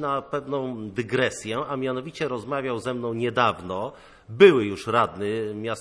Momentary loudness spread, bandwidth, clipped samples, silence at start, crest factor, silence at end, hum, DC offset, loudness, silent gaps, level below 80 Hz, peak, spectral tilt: 14 LU; 11 kHz; under 0.1%; 0 s; 22 dB; 0 s; none; under 0.1%; -24 LUFS; none; -60 dBFS; -2 dBFS; -5.5 dB/octave